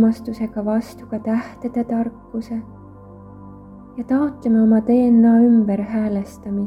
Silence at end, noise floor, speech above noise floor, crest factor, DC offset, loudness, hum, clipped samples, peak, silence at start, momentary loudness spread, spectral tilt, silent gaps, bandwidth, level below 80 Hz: 0 s; -40 dBFS; 22 dB; 14 dB; under 0.1%; -18 LUFS; 50 Hz at -50 dBFS; under 0.1%; -6 dBFS; 0 s; 16 LU; -9 dB/octave; none; 5.8 kHz; -50 dBFS